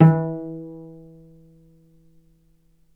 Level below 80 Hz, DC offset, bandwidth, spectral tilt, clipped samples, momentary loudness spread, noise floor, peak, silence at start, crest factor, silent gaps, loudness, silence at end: -58 dBFS; under 0.1%; 2.9 kHz; -12 dB/octave; under 0.1%; 26 LU; -59 dBFS; 0 dBFS; 0 s; 24 dB; none; -24 LUFS; 2.1 s